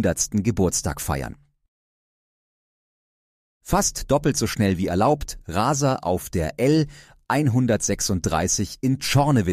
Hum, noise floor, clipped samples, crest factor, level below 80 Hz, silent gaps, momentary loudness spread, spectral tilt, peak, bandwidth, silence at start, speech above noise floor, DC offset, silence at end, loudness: none; under -90 dBFS; under 0.1%; 16 dB; -40 dBFS; 1.68-3.61 s; 6 LU; -5 dB/octave; -6 dBFS; 15.5 kHz; 0 s; over 68 dB; under 0.1%; 0 s; -22 LUFS